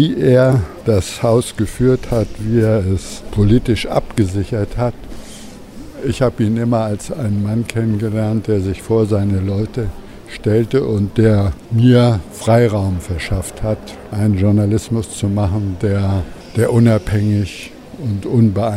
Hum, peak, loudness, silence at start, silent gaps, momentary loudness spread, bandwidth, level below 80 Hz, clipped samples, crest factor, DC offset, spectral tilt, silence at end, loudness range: none; 0 dBFS; -16 LUFS; 0 s; none; 11 LU; 13.5 kHz; -34 dBFS; under 0.1%; 14 dB; under 0.1%; -7.5 dB/octave; 0 s; 4 LU